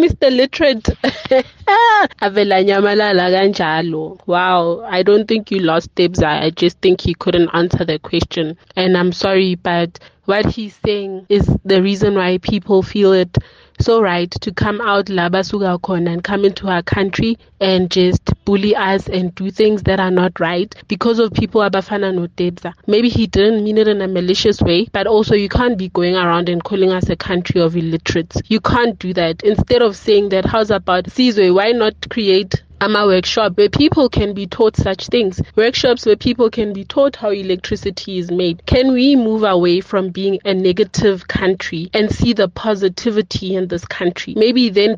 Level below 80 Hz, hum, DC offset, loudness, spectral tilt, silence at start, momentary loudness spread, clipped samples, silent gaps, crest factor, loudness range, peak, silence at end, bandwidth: -36 dBFS; none; under 0.1%; -15 LUFS; -6 dB/octave; 0 s; 7 LU; under 0.1%; none; 12 dB; 3 LU; -2 dBFS; 0 s; 7.6 kHz